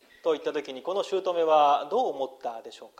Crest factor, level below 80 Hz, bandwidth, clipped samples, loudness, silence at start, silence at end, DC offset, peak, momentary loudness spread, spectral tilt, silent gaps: 18 dB; -80 dBFS; 11 kHz; under 0.1%; -26 LUFS; 0.25 s; 0.15 s; under 0.1%; -10 dBFS; 14 LU; -4 dB/octave; none